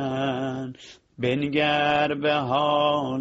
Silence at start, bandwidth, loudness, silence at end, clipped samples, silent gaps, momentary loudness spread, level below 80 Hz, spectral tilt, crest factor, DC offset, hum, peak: 0 s; 7.8 kHz; -23 LUFS; 0 s; under 0.1%; none; 9 LU; -60 dBFS; -6 dB/octave; 16 dB; under 0.1%; none; -8 dBFS